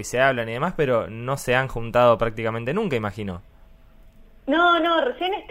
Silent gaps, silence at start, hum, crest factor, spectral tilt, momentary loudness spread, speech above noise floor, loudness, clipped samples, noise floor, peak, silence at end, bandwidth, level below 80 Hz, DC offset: none; 0 s; none; 18 dB; -5 dB/octave; 11 LU; 27 dB; -22 LUFS; under 0.1%; -49 dBFS; -4 dBFS; 0 s; 16 kHz; -44 dBFS; under 0.1%